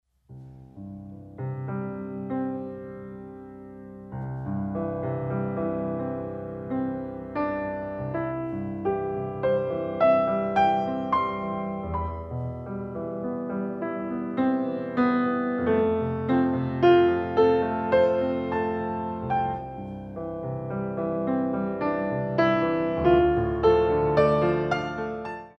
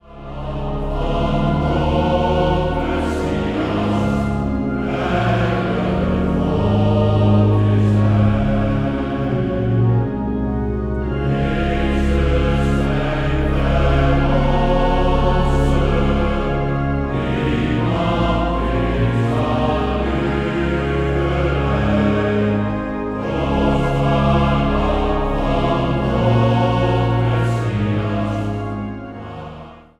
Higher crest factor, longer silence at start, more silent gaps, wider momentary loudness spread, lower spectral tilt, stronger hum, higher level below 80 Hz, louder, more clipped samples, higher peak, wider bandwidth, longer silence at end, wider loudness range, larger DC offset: about the same, 18 dB vs 14 dB; first, 0.3 s vs 0.1 s; neither; first, 15 LU vs 6 LU; about the same, -9 dB/octave vs -8 dB/octave; neither; second, -48 dBFS vs -24 dBFS; second, -26 LUFS vs -18 LUFS; neither; second, -8 dBFS vs -2 dBFS; second, 6.2 kHz vs 9.8 kHz; about the same, 0.1 s vs 0.2 s; first, 10 LU vs 3 LU; neither